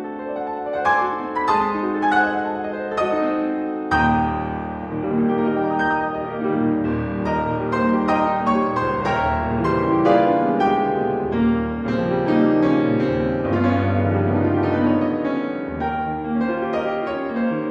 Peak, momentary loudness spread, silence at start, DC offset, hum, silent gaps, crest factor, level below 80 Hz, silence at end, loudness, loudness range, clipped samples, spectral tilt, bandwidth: -4 dBFS; 7 LU; 0 s; under 0.1%; none; none; 18 dB; -42 dBFS; 0 s; -21 LUFS; 3 LU; under 0.1%; -8 dB/octave; 8.2 kHz